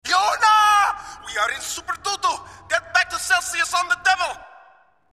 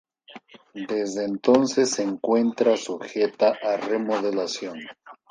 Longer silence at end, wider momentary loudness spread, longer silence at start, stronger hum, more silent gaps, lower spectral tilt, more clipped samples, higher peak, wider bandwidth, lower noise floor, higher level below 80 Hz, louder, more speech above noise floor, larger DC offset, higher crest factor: first, 0.65 s vs 0.2 s; about the same, 12 LU vs 14 LU; second, 0.05 s vs 0.3 s; neither; neither; second, 1 dB/octave vs -4 dB/octave; neither; about the same, -4 dBFS vs -2 dBFS; first, 15.5 kHz vs 10 kHz; first, -54 dBFS vs -48 dBFS; first, -56 dBFS vs -72 dBFS; first, -20 LUFS vs -23 LUFS; first, 31 dB vs 24 dB; neither; about the same, 18 dB vs 22 dB